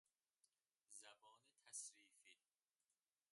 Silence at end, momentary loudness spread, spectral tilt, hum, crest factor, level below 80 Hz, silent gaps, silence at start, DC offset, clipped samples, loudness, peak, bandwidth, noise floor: 0.95 s; 10 LU; 2 dB/octave; none; 26 dB; under -90 dBFS; none; 0.45 s; under 0.1%; under 0.1%; -58 LUFS; -40 dBFS; 11.5 kHz; under -90 dBFS